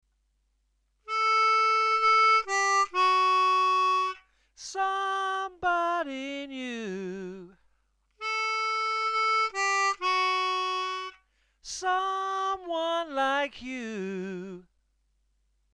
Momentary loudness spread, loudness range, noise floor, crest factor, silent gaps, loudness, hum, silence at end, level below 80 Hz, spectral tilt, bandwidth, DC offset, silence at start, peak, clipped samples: 15 LU; 9 LU; -73 dBFS; 14 dB; none; -26 LUFS; none; 1.15 s; -68 dBFS; -2 dB/octave; 10.5 kHz; under 0.1%; 1.05 s; -14 dBFS; under 0.1%